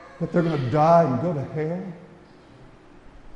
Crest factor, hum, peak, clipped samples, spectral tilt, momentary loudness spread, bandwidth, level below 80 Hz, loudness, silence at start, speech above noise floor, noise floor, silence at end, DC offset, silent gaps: 18 dB; none; -6 dBFS; under 0.1%; -8.5 dB/octave; 16 LU; 7.6 kHz; -54 dBFS; -22 LUFS; 0 s; 27 dB; -49 dBFS; 0.05 s; under 0.1%; none